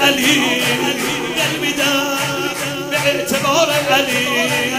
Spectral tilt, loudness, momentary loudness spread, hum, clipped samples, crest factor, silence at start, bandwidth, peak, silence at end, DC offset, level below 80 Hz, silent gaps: -2.5 dB/octave; -15 LUFS; 6 LU; none; under 0.1%; 16 dB; 0 s; 16 kHz; 0 dBFS; 0 s; under 0.1%; -52 dBFS; none